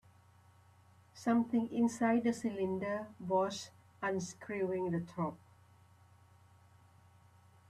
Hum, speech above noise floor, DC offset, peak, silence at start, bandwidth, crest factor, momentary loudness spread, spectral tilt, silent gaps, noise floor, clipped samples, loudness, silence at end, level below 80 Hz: none; 29 dB; under 0.1%; -20 dBFS; 1.15 s; 12.5 kHz; 18 dB; 9 LU; -6 dB/octave; none; -64 dBFS; under 0.1%; -36 LUFS; 2.35 s; -76 dBFS